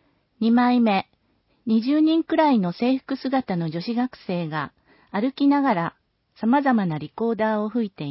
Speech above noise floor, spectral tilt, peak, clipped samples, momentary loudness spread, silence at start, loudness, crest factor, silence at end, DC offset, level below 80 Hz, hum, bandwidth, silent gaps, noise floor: 45 dB; -11 dB/octave; -6 dBFS; under 0.1%; 10 LU; 0.4 s; -22 LUFS; 16 dB; 0 s; under 0.1%; -66 dBFS; none; 5.8 kHz; none; -66 dBFS